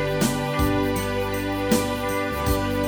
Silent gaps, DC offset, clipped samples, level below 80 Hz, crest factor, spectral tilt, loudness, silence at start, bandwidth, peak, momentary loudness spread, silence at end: none; under 0.1%; under 0.1%; -34 dBFS; 18 dB; -5 dB/octave; -24 LUFS; 0 s; over 20 kHz; -6 dBFS; 3 LU; 0 s